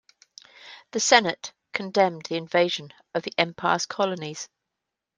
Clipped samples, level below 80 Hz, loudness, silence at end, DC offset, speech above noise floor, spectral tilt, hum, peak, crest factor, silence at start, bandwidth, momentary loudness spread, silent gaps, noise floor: under 0.1%; -72 dBFS; -24 LUFS; 0.75 s; under 0.1%; 60 dB; -2.5 dB/octave; none; -2 dBFS; 24 dB; 0.6 s; 10.5 kHz; 17 LU; none; -85 dBFS